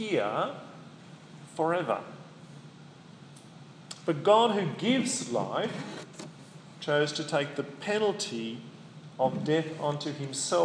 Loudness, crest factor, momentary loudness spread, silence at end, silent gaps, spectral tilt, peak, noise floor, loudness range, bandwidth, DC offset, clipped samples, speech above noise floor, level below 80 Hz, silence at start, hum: -29 LUFS; 22 dB; 23 LU; 0 s; none; -4.5 dB/octave; -10 dBFS; -50 dBFS; 7 LU; 10.5 kHz; under 0.1%; under 0.1%; 21 dB; -80 dBFS; 0 s; none